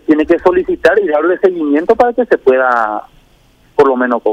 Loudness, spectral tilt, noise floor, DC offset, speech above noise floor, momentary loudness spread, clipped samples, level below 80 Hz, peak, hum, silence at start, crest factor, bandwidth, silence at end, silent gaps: -12 LUFS; -6.5 dB/octave; -49 dBFS; under 0.1%; 37 dB; 4 LU; under 0.1%; -44 dBFS; 0 dBFS; none; 0.1 s; 12 dB; 9 kHz; 0 s; none